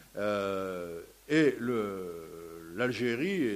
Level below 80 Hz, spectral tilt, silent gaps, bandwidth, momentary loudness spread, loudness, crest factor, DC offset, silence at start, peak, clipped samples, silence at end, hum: -66 dBFS; -6 dB/octave; none; 15.5 kHz; 17 LU; -32 LUFS; 18 dB; under 0.1%; 0 s; -14 dBFS; under 0.1%; 0 s; none